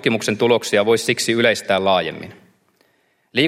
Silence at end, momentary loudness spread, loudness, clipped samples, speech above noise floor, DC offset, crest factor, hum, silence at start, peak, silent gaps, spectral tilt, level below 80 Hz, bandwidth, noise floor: 0 s; 10 LU; -18 LUFS; under 0.1%; 45 dB; under 0.1%; 18 dB; none; 0.05 s; -2 dBFS; none; -4 dB/octave; -64 dBFS; 16 kHz; -63 dBFS